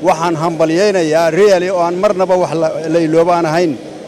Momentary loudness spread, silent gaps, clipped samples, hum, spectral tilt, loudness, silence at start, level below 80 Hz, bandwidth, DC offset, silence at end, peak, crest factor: 5 LU; none; under 0.1%; none; -5.5 dB/octave; -13 LUFS; 0 s; -52 dBFS; 14.5 kHz; under 0.1%; 0 s; -2 dBFS; 10 dB